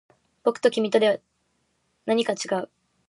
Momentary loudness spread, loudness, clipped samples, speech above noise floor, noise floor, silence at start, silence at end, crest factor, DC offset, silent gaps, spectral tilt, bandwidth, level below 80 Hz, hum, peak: 10 LU; -24 LUFS; under 0.1%; 49 dB; -71 dBFS; 0.45 s; 0.45 s; 18 dB; under 0.1%; none; -4 dB/octave; 11.5 kHz; -78 dBFS; none; -8 dBFS